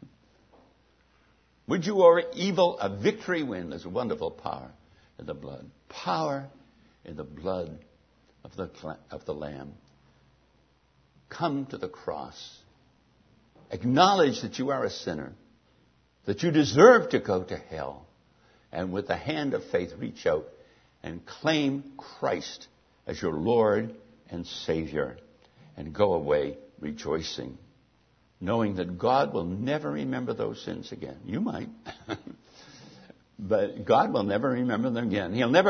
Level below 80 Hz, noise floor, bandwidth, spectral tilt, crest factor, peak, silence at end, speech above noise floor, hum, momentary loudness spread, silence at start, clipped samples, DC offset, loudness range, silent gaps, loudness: -60 dBFS; -65 dBFS; 6.6 kHz; -5.5 dB/octave; 28 dB; -2 dBFS; 0 s; 38 dB; none; 19 LU; 1.7 s; under 0.1%; under 0.1%; 13 LU; none; -27 LUFS